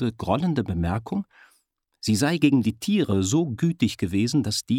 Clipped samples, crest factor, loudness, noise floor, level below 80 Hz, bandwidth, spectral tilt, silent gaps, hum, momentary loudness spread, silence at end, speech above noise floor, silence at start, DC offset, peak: under 0.1%; 18 dB; -24 LUFS; -68 dBFS; -48 dBFS; 16.5 kHz; -5.5 dB/octave; none; none; 8 LU; 0 s; 45 dB; 0 s; under 0.1%; -6 dBFS